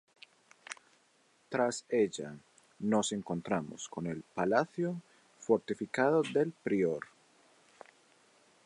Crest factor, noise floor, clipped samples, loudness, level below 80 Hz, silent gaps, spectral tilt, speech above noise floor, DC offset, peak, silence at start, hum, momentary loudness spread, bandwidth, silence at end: 22 dB; -69 dBFS; under 0.1%; -33 LUFS; -74 dBFS; none; -5 dB/octave; 37 dB; under 0.1%; -14 dBFS; 0.7 s; none; 17 LU; 11.5 kHz; 1.6 s